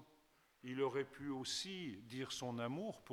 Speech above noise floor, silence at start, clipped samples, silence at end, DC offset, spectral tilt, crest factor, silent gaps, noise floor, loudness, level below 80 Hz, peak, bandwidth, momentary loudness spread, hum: 29 dB; 0 s; under 0.1%; 0 s; under 0.1%; -4 dB/octave; 18 dB; none; -73 dBFS; -44 LUFS; -78 dBFS; -28 dBFS; 18 kHz; 8 LU; none